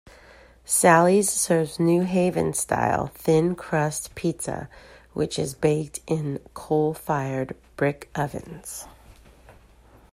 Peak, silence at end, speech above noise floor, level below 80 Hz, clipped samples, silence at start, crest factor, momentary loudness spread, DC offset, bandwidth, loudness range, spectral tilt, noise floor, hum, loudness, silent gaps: -4 dBFS; 0.6 s; 29 dB; -52 dBFS; under 0.1%; 0.7 s; 20 dB; 16 LU; under 0.1%; 16 kHz; 8 LU; -5 dB/octave; -53 dBFS; none; -23 LUFS; none